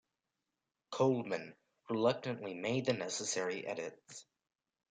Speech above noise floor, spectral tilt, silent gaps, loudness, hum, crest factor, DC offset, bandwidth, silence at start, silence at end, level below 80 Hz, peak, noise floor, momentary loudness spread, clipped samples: 53 dB; -4.5 dB/octave; none; -37 LUFS; none; 20 dB; under 0.1%; 9.6 kHz; 0.9 s; 0.7 s; -82 dBFS; -18 dBFS; -89 dBFS; 17 LU; under 0.1%